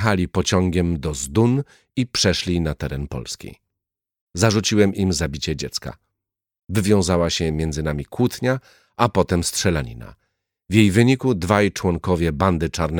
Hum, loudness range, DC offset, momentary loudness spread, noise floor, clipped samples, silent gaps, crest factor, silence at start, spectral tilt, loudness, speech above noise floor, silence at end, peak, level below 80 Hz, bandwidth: none; 3 LU; under 0.1%; 12 LU; -85 dBFS; under 0.1%; 4.21-4.27 s; 18 dB; 0 s; -5 dB/octave; -20 LUFS; 65 dB; 0 s; -2 dBFS; -38 dBFS; 19 kHz